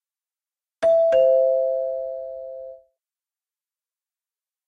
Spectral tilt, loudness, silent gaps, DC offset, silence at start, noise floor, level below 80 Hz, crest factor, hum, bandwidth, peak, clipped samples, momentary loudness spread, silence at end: -4.5 dB/octave; -20 LUFS; none; under 0.1%; 0.8 s; under -90 dBFS; -66 dBFS; 16 dB; none; 9.4 kHz; -8 dBFS; under 0.1%; 20 LU; 1.9 s